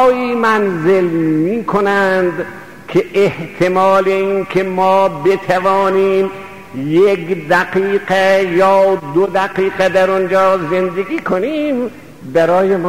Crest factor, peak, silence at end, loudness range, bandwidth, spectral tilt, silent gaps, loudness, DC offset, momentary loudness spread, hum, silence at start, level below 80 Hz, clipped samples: 12 dB; -2 dBFS; 0 s; 2 LU; 15.5 kHz; -6.5 dB/octave; none; -14 LUFS; 0.8%; 7 LU; none; 0 s; -50 dBFS; under 0.1%